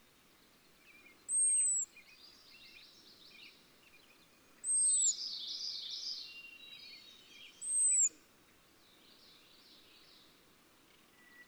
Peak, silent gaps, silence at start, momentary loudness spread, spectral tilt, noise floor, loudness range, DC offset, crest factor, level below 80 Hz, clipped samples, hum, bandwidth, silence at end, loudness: -24 dBFS; none; 1.3 s; 27 LU; 3 dB/octave; -66 dBFS; 1 LU; under 0.1%; 16 dB; -82 dBFS; under 0.1%; none; over 20 kHz; 0.05 s; -32 LUFS